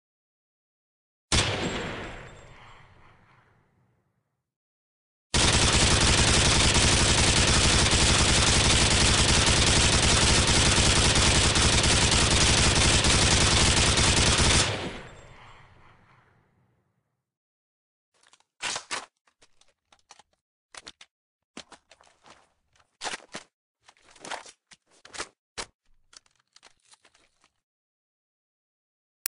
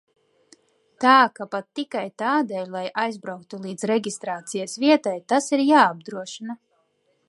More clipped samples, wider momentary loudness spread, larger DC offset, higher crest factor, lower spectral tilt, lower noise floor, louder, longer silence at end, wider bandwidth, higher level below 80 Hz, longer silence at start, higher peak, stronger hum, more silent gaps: neither; about the same, 19 LU vs 18 LU; neither; about the same, 18 dB vs 20 dB; second, -2.5 dB/octave vs -4 dB/octave; first, -77 dBFS vs -68 dBFS; about the same, -20 LUFS vs -22 LUFS; first, 3.65 s vs 0.75 s; about the same, 11 kHz vs 11.5 kHz; first, -34 dBFS vs -80 dBFS; first, 1.3 s vs 1 s; second, -8 dBFS vs -2 dBFS; neither; first, 4.56-5.30 s, 17.37-18.12 s, 19.21-19.25 s, 20.41-20.69 s, 21.11-21.54 s, 23.53-23.75 s, 25.39-25.56 s vs none